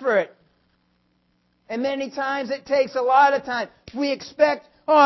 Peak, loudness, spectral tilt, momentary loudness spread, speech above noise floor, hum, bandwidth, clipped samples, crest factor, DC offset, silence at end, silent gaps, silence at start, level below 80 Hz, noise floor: -4 dBFS; -22 LUFS; -4 dB/octave; 12 LU; 45 dB; none; 6.2 kHz; under 0.1%; 18 dB; under 0.1%; 0 s; none; 0 s; -64 dBFS; -66 dBFS